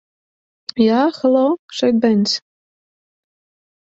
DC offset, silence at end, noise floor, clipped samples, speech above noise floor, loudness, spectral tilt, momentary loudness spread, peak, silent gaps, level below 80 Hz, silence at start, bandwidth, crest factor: under 0.1%; 1.6 s; under -90 dBFS; under 0.1%; over 75 dB; -16 LUFS; -5.5 dB/octave; 9 LU; -2 dBFS; 1.59-1.68 s; -64 dBFS; 0.75 s; 7.8 kHz; 16 dB